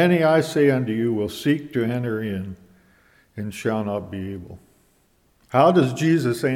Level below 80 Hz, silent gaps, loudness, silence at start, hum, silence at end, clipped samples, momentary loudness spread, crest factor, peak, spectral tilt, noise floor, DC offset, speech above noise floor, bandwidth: -58 dBFS; none; -21 LUFS; 0 s; none; 0 s; under 0.1%; 16 LU; 18 dB; -4 dBFS; -6.5 dB/octave; -62 dBFS; under 0.1%; 41 dB; 16.5 kHz